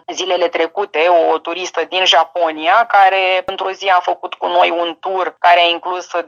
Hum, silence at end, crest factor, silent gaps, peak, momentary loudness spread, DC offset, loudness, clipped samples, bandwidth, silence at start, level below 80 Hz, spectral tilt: none; 0 s; 14 dB; none; -2 dBFS; 9 LU; under 0.1%; -14 LUFS; under 0.1%; 7.4 kHz; 0.1 s; -66 dBFS; -1 dB/octave